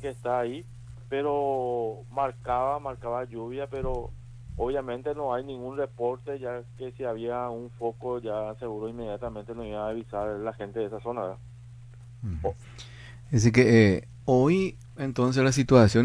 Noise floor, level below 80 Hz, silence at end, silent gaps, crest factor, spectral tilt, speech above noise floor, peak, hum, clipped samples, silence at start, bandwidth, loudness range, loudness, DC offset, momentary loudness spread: -46 dBFS; -48 dBFS; 0 s; none; 22 dB; -6.5 dB/octave; 19 dB; -6 dBFS; none; under 0.1%; 0 s; 11 kHz; 10 LU; -28 LUFS; under 0.1%; 20 LU